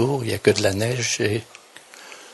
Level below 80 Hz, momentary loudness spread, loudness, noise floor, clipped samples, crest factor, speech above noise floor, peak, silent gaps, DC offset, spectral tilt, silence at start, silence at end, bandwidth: -60 dBFS; 22 LU; -21 LUFS; -45 dBFS; under 0.1%; 22 dB; 24 dB; 0 dBFS; none; under 0.1%; -4 dB/octave; 0 s; 0 s; 12 kHz